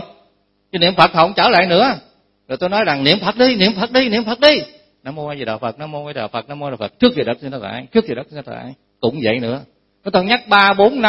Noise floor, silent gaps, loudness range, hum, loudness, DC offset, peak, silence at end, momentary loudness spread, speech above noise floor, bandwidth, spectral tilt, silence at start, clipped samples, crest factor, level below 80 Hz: -60 dBFS; none; 7 LU; none; -15 LUFS; under 0.1%; 0 dBFS; 0 s; 17 LU; 44 dB; 11 kHz; -6.5 dB/octave; 0 s; under 0.1%; 16 dB; -52 dBFS